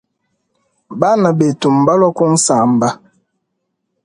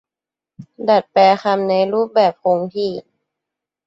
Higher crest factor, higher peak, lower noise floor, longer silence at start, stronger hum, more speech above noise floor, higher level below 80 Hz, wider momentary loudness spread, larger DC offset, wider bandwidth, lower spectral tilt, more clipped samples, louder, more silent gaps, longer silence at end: about the same, 14 dB vs 16 dB; about the same, 0 dBFS vs -2 dBFS; second, -71 dBFS vs -88 dBFS; first, 0.9 s vs 0.6 s; neither; second, 59 dB vs 72 dB; first, -58 dBFS vs -66 dBFS; second, 7 LU vs 11 LU; neither; first, 11.5 kHz vs 7.8 kHz; about the same, -5.5 dB/octave vs -6.5 dB/octave; neither; first, -13 LUFS vs -16 LUFS; neither; first, 1.1 s vs 0.85 s